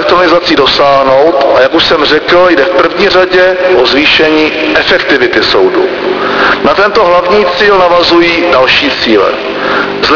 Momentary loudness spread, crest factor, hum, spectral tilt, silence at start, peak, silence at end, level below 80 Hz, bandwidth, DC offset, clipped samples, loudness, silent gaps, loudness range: 4 LU; 6 dB; none; -4.5 dB/octave; 0 s; 0 dBFS; 0 s; -36 dBFS; 5.4 kHz; under 0.1%; 2%; -6 LUFS; none; 1 LU